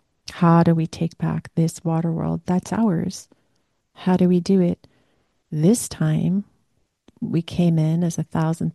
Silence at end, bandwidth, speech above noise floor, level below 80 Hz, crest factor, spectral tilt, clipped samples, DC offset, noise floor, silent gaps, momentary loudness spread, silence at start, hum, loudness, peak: 0.05 s; 12.5 kHz; 49 dB; -54 dBFS; 16 dB; -7 dB/octave; under 0.1%; under 0.1%; -69 dBFS; none; 9 LU; 0.3 s; none; -21 LUFS; -4 dBFS